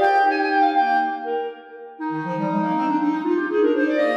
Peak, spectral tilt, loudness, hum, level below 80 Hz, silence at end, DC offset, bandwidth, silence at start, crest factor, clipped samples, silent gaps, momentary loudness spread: -6 dBFS; -7 dB/octave; -21 LUFS; none; -76 dBFS; 0 s; under 0.1%; 7.2 kHz; 0 s; 14 dB; under 0.1%; none; 12 LU